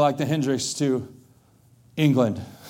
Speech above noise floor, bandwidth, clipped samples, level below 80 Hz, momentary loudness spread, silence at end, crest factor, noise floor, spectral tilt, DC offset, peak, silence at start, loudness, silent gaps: 34 dB; 16.5 kHz; under 0.1%; -64 dBFS; 11 LU; 0 s; 18 dB; -56 dBFS; -5.5 dB/octave; under 0.1%; -6 dBFS; 0 s; -23 LUFS; none